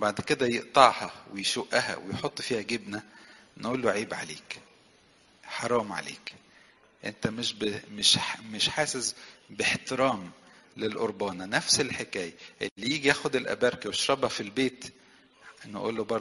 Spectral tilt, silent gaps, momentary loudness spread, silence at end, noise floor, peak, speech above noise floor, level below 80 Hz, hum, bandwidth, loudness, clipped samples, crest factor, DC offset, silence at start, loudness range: -2.5 dB/octave; 12.71-12.76 s; 16 LU; 0 s; -61 dBFS; -2 dBFS; 32 dB; -64 dBFS; none; 11.5 kHz; -28 LUFS; under 0.1%; 28 dB; under 0.1%; 0 s; 7 LU